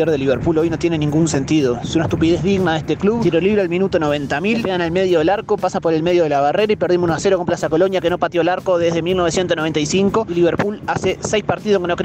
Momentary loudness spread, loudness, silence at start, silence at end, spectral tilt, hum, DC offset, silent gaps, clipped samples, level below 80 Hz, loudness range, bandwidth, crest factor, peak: 3 LU; -17 LUFS; 0 s; 0 s; -5.5 dB/octave; none; under 0.1%; none; under 0.1%; -42 dBFS; 1 LU; 9.2 kHz; 12 dB; -6 dBFS